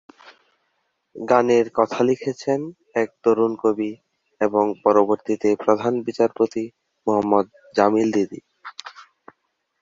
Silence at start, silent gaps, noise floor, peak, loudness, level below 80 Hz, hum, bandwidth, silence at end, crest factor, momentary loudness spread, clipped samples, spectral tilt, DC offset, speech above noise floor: 1.15 s; none; -72 dBFS; -2 dBFS; -21 LUFS; -64 dBFS; none; 7.6 kHz; 0.8 s; 20 dB; 14 LU; under 0.1%; -6.5 dB/octave; under 0.1%; 52 dB